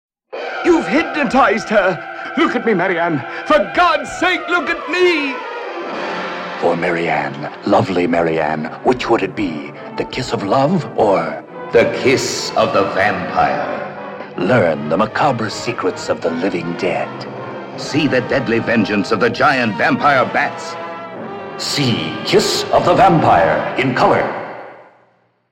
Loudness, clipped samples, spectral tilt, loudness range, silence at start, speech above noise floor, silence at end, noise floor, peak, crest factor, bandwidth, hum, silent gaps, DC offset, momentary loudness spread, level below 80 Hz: -16 LUFS; under 0.1%; -5 dB/octave; 4 LU; 0.3 s; 41 dB; 0.7 s; -57 dBFS; -2 dBFS; 16 dB; 16 kHz; none; none; under 0.1%; 12 LU; -48 dBFS